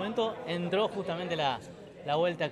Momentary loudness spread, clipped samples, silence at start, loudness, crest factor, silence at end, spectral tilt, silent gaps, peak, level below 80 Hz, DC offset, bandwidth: 9 LU; under 0.1%; 0 s; -32 LUFS; 16 dB; 0 s; -6 dB/octave; none; -16 dBFS; -68 dBFS; under 0.1%; 11.5 kHz